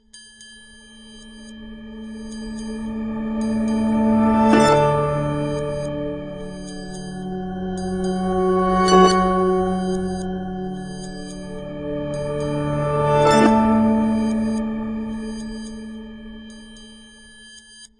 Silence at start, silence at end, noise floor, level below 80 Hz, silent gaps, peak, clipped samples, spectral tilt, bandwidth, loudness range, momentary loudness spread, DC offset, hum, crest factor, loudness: 0.15 s; 0.15 s; -45 dBFS; -42 dBFS; none; -2 dBFS; under 0.1%; -6 dB/octave; 11.5 kHz; 9 LU; 24 LU; under 0.1%; none; 20 dB; -20 LUFS